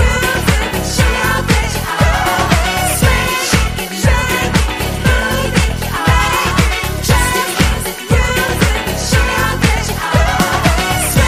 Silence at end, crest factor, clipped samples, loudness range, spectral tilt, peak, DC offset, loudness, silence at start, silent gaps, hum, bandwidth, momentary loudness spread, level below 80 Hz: 0 s; 14 dB; under 0.1%; 1 LU; -4 dB/octave; 0 dBFS; 0.3%; -14 LUFS; 0 s; none; none; 15.5 kHz; 3 LU; -20 dBFS